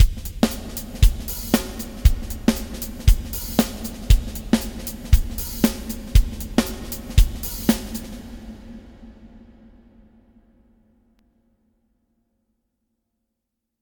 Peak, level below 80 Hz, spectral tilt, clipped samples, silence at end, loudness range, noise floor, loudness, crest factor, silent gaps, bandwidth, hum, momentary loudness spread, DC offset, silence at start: 0 dBFS; -24 dBFS; -5.5 dB/octave; under 0.1%; 4.45 s; 7 LU; -80 dBFS; -23 LUFS; 22 dB; none; 19.5 kHz; none; 12 LU; under 0.1%; 0 s